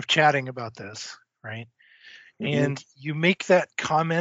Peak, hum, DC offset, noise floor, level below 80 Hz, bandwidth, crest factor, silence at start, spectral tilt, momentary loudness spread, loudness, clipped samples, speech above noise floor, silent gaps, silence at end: -6 dBFS; none; under 0.1%; -51 dBFS; -68 dBFS; 8 kHz; 20 dB; 0 s; -3.5 dB/octave; 18 LU; -24 LUFS; under 0.1%; 26 dB; none; 0 s